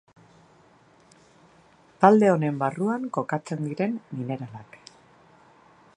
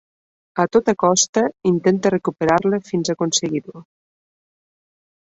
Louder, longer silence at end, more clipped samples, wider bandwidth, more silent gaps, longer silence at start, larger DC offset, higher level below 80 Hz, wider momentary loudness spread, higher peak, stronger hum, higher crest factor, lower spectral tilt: second, -24 LUFS vs -19 LUFS; second, 1.35 s vs 1.55 s; neither; first, 10 kHz vs 8.2 kHz; second, none vs 1.29-1.33 s; first, 2 s vs 0.55 s; neither; second, -70 dBFS vs -58 dBFS; first, 16 LU vs 7 LU; about the same, -2 dBFS vs -2 dBFS; neither; first, 26 dB vs 18 dB; first, -8 dB/octave vs -4 dB/octave